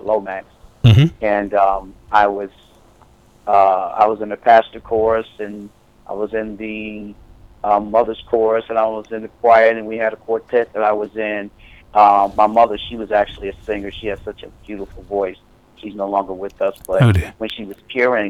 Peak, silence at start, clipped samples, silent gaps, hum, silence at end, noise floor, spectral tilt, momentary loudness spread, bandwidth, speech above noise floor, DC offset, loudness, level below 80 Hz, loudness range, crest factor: 0 dBFS; 0.05 s; under 0.1%; none; none; 0 s; -49 dBFS; -7.5 dB/octave; 18 LU; 13.5 kHz; 32 dB; under 0.1%; -17 LUFS; -42 dBFS; 7 LU; 18 dB